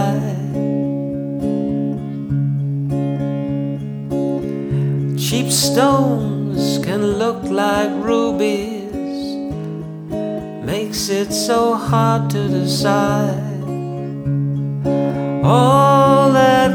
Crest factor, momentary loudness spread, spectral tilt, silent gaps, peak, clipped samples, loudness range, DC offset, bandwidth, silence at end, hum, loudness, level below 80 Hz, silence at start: 16 dB; 13 LU; -5.5 dB/octave; none; 0 dBFS; under 0.1%; 5 LU; under 0.1%; 19 kHz; 0 s; none; -18 LUFS; -44 dBFS; 0 s